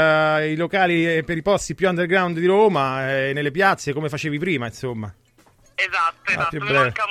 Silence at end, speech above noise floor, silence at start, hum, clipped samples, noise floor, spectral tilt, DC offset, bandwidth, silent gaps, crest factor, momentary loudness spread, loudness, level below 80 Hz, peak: 0 s; 35 dB; 0 s; none; under 0.1%; -55 dBFS; -5.5 dB/octave; under 0.1%; 15 kHz; none; 18 dB; 8 LU; -20 LUFS; -52 dBFS; -4 dBFS